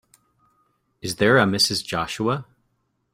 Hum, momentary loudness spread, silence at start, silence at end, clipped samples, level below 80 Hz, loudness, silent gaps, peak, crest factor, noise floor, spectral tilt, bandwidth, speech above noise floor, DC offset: none; 13 LU; 1.05 s; 0.7 s; under 0.1%; -56 dBFS; -21 LUFS; none; -4 dBFS; 20 dB; -71 dBFS; -4 dB/octave; 16 kHz; 50 dB; under 0.1%